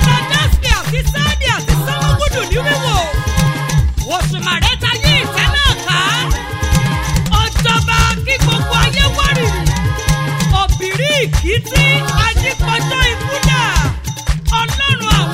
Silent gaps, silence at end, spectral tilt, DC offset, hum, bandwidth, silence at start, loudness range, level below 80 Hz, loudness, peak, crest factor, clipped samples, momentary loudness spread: none; 0 s; -4 dB/octave; under 0.1%; none; 16.5 kHz; 0 s; 2 LU; -20 dBFS; -14 LUFS; -2 dBFS; 12 dB; under 0.1%; 4 LU